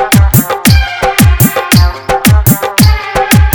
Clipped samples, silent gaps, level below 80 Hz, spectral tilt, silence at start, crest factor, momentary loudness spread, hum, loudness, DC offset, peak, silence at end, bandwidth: 2%; none; -14 dBFS; -4.5 dB/octave; 0 s; 8 dB; 3 LU; none; -8 LUFS; under 0.1%; 0 dBFS; 0 s; over 20 kHz